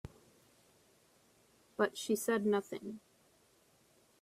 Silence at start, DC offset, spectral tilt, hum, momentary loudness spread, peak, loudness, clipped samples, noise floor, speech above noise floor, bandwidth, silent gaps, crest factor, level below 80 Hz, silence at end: 0.05 s; under 0.1%; -4.5 dB/octave; none; 19 LU; -18 dBFS; -36 LUFS; under 0.1%; -69 dBFS; 35 dB; 15.5 kHz; none; 22 dB; -72 dBFS; 1.25 s